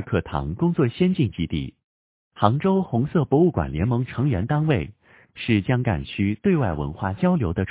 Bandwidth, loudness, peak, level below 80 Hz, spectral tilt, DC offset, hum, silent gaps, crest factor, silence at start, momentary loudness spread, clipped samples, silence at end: 4 kHz; -23 LUFS; 0 dBFS; -40 dBFS; -12 dB/octave; under 0.1%; none; 1.84-2.31 s; 22 dB; 0 s; 8 LU; under 0.1%; 0 s